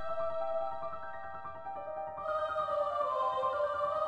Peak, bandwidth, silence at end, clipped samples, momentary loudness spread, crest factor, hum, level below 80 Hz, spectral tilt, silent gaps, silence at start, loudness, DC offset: -22 dBFS; 9.4 kHz; 0 s; under 0.1%; 11 LU; 14 dB; none; -68 dBFS; -5 dB/octave; none; 0 s; -35 LUFS; under 0.1%